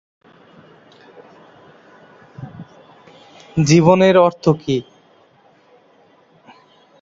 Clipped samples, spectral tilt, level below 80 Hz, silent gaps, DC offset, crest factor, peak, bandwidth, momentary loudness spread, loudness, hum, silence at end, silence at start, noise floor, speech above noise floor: under 0.1%; -6 dB/octave; -54 dBFS; none; under 0.1%; 18 dB; -2 dBFS; 7.8 kHz; 25 LU; -14 LUFS; none; 2.2 s; 2.4 s; -53 dBFS; 40 dB